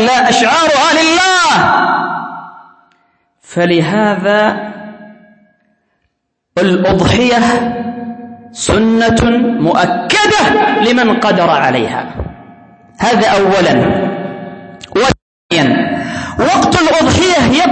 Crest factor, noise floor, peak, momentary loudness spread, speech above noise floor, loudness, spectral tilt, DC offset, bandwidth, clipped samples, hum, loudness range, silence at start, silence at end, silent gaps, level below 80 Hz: 12 dB; -68 dBFS; 0 dBFS; 15 LU; 57 dB; -11 LUFS; -4.5 dB/octave; under 0.1%; 8.8 kHz; under 0.1%; none; 5 LU; 0 s; 0 s; 15.22-15.49 s; -36 dBFS